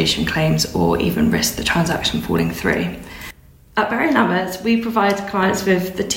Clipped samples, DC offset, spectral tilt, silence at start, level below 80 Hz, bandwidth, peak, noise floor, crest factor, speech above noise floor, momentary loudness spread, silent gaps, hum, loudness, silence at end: under 0.1%; under 0.1%; -4.5 dB/octave; 0 s; -38 dBFS; 16.5 kHz; -2 dBFS; -41 dBFS; 16 dB; 23 dB; 6 LU; none; none; -18 LUFS; 0 s